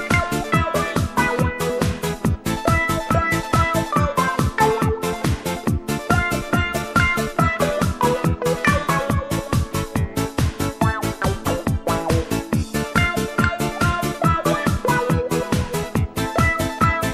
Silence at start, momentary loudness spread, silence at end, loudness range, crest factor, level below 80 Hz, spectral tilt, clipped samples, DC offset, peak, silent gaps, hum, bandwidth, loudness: 0 s; 4 LU; 0 s; 2 LU; 18 dB; -32 dBFS; -5.5 dB/octave; under 0.1%; under 0.1%; -2 dBFS; none; none; 15.5 kHz; -21 LUFS